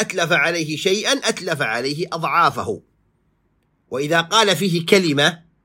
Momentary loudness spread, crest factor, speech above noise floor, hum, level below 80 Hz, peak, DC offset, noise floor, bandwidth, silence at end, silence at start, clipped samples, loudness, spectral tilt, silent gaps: 10 LU; 20 dB; 46 dB; none; -64 dBFS; 0 dBFS; under 0.1%; -65 dBFS; 16.5 kHz; 0.25 s; 0 s; under 0.1%; -18 LUFS; -3.5 dB/octave; none